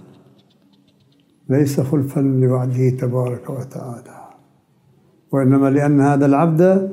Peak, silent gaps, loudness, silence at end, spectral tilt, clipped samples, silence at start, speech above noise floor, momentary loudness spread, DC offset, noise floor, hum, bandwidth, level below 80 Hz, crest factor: -2 dBFS; none; -17 LUFS; 0 s; -9 dB/octave; under 0.1%; 1.5 s; 40 dB; 15 LU; under 0.1%; -56 dBFS; none; 15.5 kHz; -64 dBFS; 16 dB